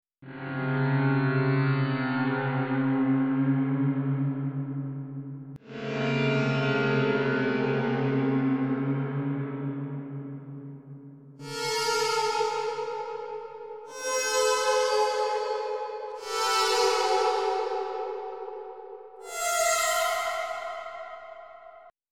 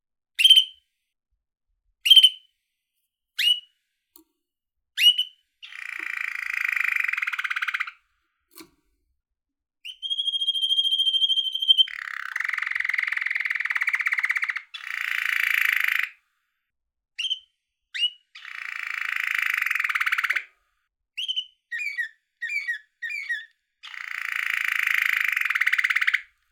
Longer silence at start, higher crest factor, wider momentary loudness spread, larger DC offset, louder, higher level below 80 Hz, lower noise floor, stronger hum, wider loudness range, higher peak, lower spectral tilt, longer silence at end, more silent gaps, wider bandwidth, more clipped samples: second, 0.2 s vs 0.4 s; second, 16 dB vs 24 dB; about the same, 17 LU vs 16 LU; neither; second, -27 LUFS vs -22 LUFS; first, -70 dBFS vs -80 dBFS; second, -51 dBFS vs -82 dBFS; neither; second, 4 LU vs 9 LU; second, -12 dBFS vs -2 dBFS; first, -5 dB/octave vs 5.5 dB/octave; about the same, 0.2 s vs 0.3 s; neither; second, 17.5 kHz vs over 20 kHz; neither